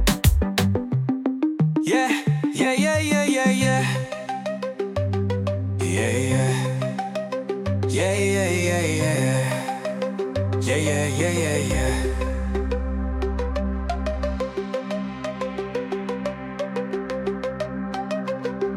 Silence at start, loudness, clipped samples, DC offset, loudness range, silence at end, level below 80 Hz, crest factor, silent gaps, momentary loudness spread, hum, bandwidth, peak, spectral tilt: 0 s; -24 LUFS; under 0.1%; under 0.1%; 7 LU; 0 s; -34 dBFS; 18 dB; none; 8 LU; none; 16 kHz; -6 dBFS; -5.5 dB/octave